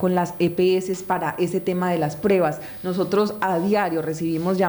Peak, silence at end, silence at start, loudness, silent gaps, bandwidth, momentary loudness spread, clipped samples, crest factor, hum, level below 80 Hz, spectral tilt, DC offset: -8 dBFS; 0 s; 0 s; -22 LUFS; none; over 20 kHz; 5 LU; under 0.1%; 14 dB; none; -58 dBFS; -6.5 dB/octave; under 0.1%